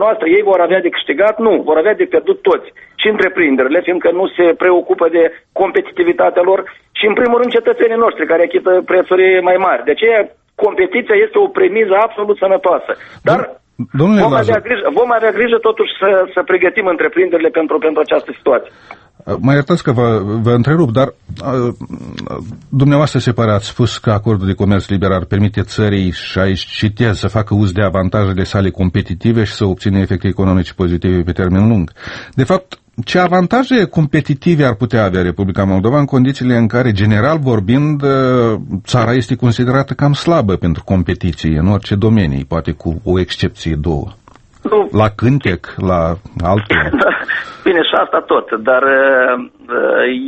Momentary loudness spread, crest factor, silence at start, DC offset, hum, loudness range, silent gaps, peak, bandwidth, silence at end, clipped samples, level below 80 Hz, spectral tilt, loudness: 6 LU; 12 dB; 0 s; under 0.1%; none; 3 LU; none; 0 dBFS; 8.6 kHz; 0 s; under 0.1%; -36 dBFS; -7.5 dB/octave; -13 LUFS